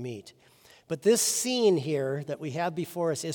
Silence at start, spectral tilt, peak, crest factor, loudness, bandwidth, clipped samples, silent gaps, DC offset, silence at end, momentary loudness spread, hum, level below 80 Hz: 0 s; -4 dB/octave; -12 dBFS; 18 dB; -27 LUFS; 18 kHz; under 0.1%; none; under 0.1%; 0 s; 13 LU; none; -78 dBFS